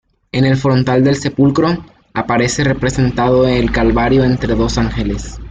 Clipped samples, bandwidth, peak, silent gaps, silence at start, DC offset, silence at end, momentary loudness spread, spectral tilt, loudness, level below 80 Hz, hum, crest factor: under 0.1%; 9.2 kHz; -2 dBFS; none; 0.35 s; under 0.1%; 0 s; 9 LU; -6 dB/octave; -14 LUFS; -28 dBFS; none; 12 dB